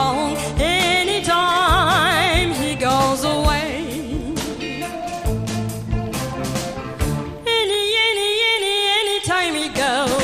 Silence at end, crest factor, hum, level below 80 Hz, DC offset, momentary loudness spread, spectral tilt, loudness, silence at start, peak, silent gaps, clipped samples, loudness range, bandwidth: 0 s; 16 dB; none; -32 dBFS; under 0.1%; 10 LU; -3.5 dB/octave; -19 LUFS; 0 s; -4 dBFS; none; under 0.1%; 8 LU; 15.5 kHz